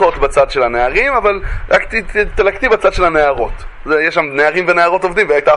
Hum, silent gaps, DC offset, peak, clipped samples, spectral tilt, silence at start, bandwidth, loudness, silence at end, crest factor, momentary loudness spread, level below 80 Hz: none; none; under 0.1%; 0 dBFS; under 0.1%; -5 dB/octave; 0 s; 11.5 kHz; -13 LUFS; 0 s; 12 dB; 5 LU; -28 dBFS